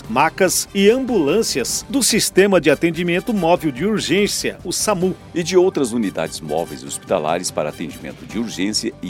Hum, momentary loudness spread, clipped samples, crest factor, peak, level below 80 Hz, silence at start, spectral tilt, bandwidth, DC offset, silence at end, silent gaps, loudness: none; 11 LU; under 0.1%; 16 dB; -2 dBFS; -46 dBFS; 0 s; -3.5 dB/octave; 17 kHz; under 0.1%; 0 s; none; -18 LUFS